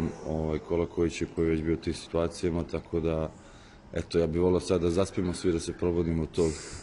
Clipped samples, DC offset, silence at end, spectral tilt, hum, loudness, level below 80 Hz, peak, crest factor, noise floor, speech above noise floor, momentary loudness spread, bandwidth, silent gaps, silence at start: under 0.1%; under 0.1%; 0 s; -6.5 dB/octave; none; -29 LUFS; -44 dBFS; -14 dBFS; 16 dB; -50 dBFS; 22 dB; 6 LU; 11 kHz; none; 0 s